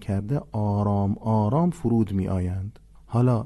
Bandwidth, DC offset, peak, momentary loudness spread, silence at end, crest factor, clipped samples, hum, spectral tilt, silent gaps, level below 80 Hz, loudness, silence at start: 11.5 kHz; under 0.1%; -10 dBFS; 7 LU; 0 s; 14 dB; under 0.1%; none; -10 dB/octave; none; -42 dBFS; -25 LUFS; 0 s